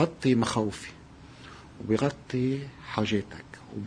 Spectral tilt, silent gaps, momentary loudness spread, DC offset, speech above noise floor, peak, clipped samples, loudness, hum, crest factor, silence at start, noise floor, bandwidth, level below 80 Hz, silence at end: -6 dB/octave; none; 22 LU; under 0.1%; 20 dB; -10 dBFS; under 0.1%; -29 LUFS; none; 20 dB; 0 s; -49 dBFS; 10.5 kHz; -56 dBFS; 0 s